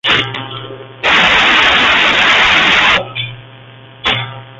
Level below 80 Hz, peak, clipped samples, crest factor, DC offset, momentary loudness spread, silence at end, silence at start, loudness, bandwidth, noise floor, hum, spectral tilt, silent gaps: -40 dBFS; 0 dBFS; under 0.1%; 12 dB; under 0.1%; 16 LU; 0 s; 0.05 s; -9 LUFS; 8.2 kHz; -36 dBFS; none; -2.5 dB/octave; none